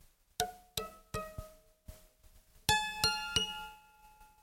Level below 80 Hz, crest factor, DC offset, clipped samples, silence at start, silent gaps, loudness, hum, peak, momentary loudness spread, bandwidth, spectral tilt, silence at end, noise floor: -56 dBFS; 28 dB; under 0.1%; under 0.1%; 0.4 s; none; -35 LUFS; none; -12 dBFS; 18 LU; 16.5 kHz; -1.5 dB/octave; 0.15 s; -62 dBFS